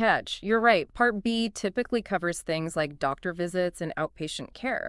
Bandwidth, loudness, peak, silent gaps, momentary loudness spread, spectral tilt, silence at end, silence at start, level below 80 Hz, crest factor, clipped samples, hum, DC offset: 12 kHz; -28 LUFS; -8 dBFS; none; 9 LU; -4.5 dB/octave; 0 s; 0 s; -54 dBFS; 20 dB; under 0.1%; none; under 0.1%